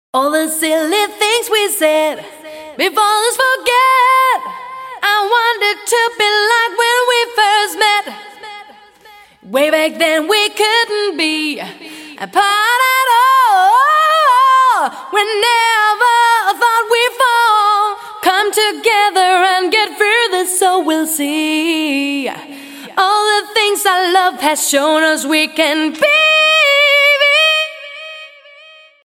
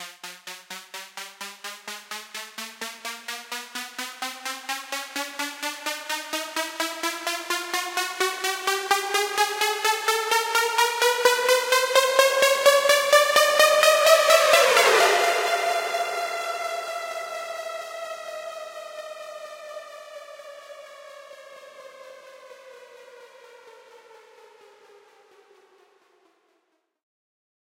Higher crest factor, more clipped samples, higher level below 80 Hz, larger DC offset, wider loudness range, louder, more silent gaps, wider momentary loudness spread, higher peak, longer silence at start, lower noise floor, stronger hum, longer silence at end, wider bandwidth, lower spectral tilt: second, 12 dB vs 24 dB; neither; first, -66 dBFS vs -82 dBFS; neither; second, 4 LU vs 21 LU; first, -12 LUFS vs -22 LUFS; neither; second, 12 LU vs 22 LU; about the same, 0 dBFS vs -2 dBFS; first, 0.15 s vs 0 s; second, -42 dBFS vs -72 dBFS; neither; second, 0.75 s vs 3.7 s; about the same, 16.5 kHz vs 17 kHz; about the same, 0 dB/octave vs 1 dB/octave